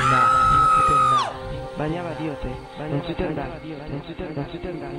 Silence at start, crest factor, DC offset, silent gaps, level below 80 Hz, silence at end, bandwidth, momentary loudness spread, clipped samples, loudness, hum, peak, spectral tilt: 0 s; 16 dB; under 0.1%; none; -40 dBFS; 0 s; 12.5 kHz; 17 LU; under 0.1%; -21 LUFS; none; -6 dBFS; -5.5 dB/octave